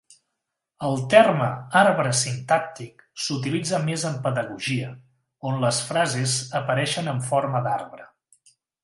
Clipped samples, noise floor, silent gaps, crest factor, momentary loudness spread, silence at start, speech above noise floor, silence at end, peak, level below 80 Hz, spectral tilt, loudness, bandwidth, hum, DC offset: under 0.1%; -82 dBFS; none; 22 dB; 12 LU; 0.8 s; 59 dB; 0.8 s; -2 dBFS; -66 dBFS; -4.5 dB/octave; -23 LUFS; 11.5 kHz; none; under 0.1%